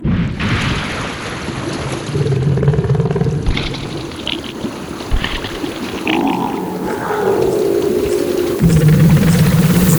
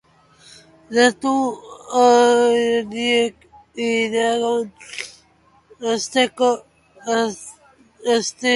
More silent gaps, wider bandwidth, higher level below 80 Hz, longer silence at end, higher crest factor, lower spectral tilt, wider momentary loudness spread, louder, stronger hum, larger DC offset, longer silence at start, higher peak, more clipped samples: neither; first, over 20 kHz vs 11.5 kHz; first, -28 dBFS vs -62 dBFS; about the same, 0 s vs 0 s; second, 14 dB vs 20 dB; first, -6 dB/octave vs -2.5 dB/octave; second, 12 LU vs 17 LU; first, -16 LUFS vs -19 LUFS; neither; neither; second, 0 s vs 0.9 s; about the same, 0 dBFS vs 0 dBFS; neither